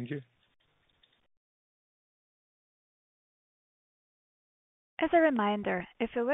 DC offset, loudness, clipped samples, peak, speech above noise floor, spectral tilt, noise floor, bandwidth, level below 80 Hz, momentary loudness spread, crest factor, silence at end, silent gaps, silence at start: under 0.1%; -30 LUFS; under 0.1%; -14 dBFS; 41 dB; -4.5 dB/octave; -71 dBFS; 3.9 kHz; -68 dBFS; 16 LU; 20 dB; 0 s; 1.37-4.97 s; 0 s